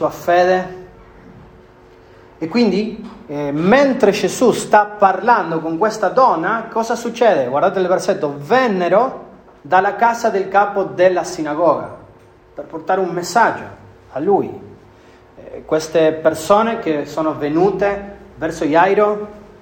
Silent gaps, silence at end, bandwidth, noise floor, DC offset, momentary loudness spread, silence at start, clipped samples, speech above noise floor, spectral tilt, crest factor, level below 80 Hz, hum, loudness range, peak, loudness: none; 0.15 s; 16.5 kHz; -45 dBFS; under 0.1%; 15 LU; 0 s; under 0.1%; 30 dB; -5 dB/octave; 16 dB; -52 dBFS; none; 5 LU; 0 dBFS; -16 LUFS